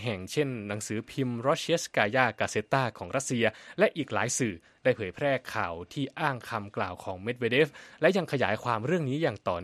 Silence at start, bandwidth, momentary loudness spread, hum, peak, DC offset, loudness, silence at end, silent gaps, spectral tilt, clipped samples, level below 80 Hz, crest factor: 0 s; 13.5 kHz; 8 LU; none; -6 dBFS; under 0.1%; -29 LUFS; 0 s; none; -4.5 dB/octave; under 0.1%; -66 dBFS; 22 dB